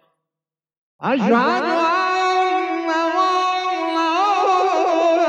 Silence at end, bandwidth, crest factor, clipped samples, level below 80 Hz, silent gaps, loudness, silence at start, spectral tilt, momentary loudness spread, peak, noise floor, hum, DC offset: 0 s; 9.4 kHz; 14 dB; under 0.1%; -78 dBFS; none; -18 LUFS; 1 s; -4.5 dB/octave; 5 LU; -4 dBFS; -89 dBFS; none; under 0.1%